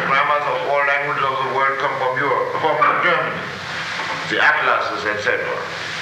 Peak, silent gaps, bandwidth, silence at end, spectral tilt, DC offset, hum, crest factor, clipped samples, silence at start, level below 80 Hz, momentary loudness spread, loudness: -4 dBFS; none; 15.5 kHz; 0 s; -3.5 dB/octave; under 0.1%; none; 16 dB; under 0.1%; 0 s; -58 dBFS; 9 LU; -18 LUFS